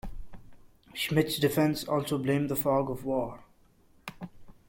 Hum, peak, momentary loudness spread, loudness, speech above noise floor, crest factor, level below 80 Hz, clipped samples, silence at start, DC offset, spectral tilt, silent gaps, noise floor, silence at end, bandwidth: none; -12 dBFS; 20 LU; -29 LUFS; 33 dB; 20 dB; -52 dBFS; under 0.1%; 0.05 s; under 0.1%; -5.5 dB/octave; none; -61 dBFS; 0.15 s; 16.5 kHz